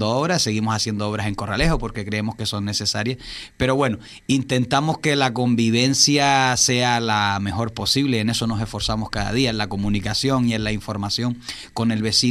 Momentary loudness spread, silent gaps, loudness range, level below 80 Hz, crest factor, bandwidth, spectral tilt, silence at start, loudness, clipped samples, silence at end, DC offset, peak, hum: 9 LU; none; 5 LU; -38 dBFS; 18 dB; 14.5 kHz; -4 dB/octave; 0 s; -20 LUFS; under 0.1%; 0 s; under 0.1%; -2 dBFS; none